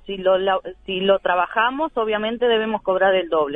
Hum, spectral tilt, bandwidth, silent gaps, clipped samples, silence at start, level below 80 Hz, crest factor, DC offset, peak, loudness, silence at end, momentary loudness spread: none; -7 dB/octave; 3.9 kHz; none; under 0.1%; 0.05 s; -52 dBFS; 14 dB; under 0.1%; -6 dBFS; -20 LUFS; 0 s; 5 LU